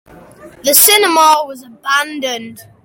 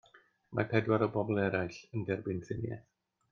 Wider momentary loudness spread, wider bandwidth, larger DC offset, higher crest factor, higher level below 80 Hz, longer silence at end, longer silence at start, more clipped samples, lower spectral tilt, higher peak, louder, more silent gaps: first, 18 LU vs 10 LU; first, over 20 kHz vs 7.2 kHz; neither; second, 14 dB vs 22 dB; first, -56 dBFS vs -66 dBFS; second, 0.25 s vs 0.5 s; first, 0.45 s vs 0.15 s; first, 0.2% vs under 0.1%; second, 0 dB/octave vs -8 dB/octave; first, 0 dBFS vs -14 dBFS; first, -10 LUFS vs -34 LUFS; neither